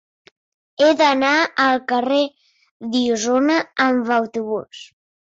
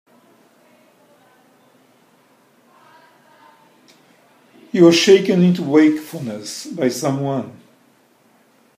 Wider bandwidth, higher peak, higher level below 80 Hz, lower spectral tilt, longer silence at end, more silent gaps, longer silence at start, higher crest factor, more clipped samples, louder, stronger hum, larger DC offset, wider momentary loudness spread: second, 8 kHz vs 15.5 kHz; second, -6 dBFS vs 0 dBFS; first, -64 dBFS vs -70 dBFS; second, -3 dB/octave vs -5.5 dB/octave; second, 0.45 s vs 1.25 s; first, 2.71-2.80 s vs none; second, 0.8 s vs 4.75 s; second, 14 dB vs 20 dB; neither; about the same, -18 LUFS vs -16 LUFS; neither; neither; second, 13 LU vs 17 LU